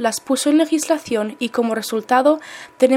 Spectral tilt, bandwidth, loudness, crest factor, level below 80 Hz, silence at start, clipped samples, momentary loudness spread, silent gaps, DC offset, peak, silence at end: -3 dB/octave; 16.5 kHz; -19 LUFS; 16 dB; -66 dBFS; 0 s; under 0.1%; 7 LU; none; under 0.1%; -2 dBFS; 0 s